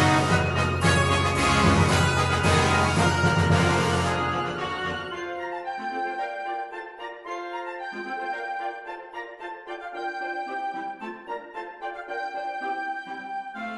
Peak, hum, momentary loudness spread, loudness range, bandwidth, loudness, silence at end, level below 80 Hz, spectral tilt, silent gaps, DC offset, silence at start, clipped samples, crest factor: -6 dBFS; none; 16 LU; 13 LU; 11.5 kHz; -25 LUFS; 0 s; -44 dBFS; -5 dB/octave; none; under 0.1%; 0 s; under 0.1%; 18 dB